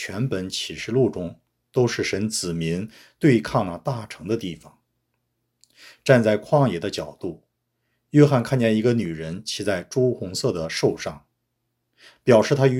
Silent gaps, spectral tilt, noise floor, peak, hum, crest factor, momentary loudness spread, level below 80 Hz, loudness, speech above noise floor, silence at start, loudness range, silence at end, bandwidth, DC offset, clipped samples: none; -6 dB/octave; -76 dBFS; 0 dBFS; none; 22 dB; 14 LU; -56 dBFS; -22 LUFS; 54 dB; 0 s; 4 LU; 0 s; 15.5 kHz; under 0.1%; under 0.1%